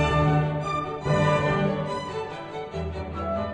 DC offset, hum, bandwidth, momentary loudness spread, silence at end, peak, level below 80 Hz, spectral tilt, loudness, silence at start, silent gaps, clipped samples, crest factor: under 0.1%; none; 9.4 kHz; 11 LU; 0 s; -10 dBFS; -40 dBFS; -7 dB/octave; -26 LUFS; 0 s; none; under 0.1%; 14 dB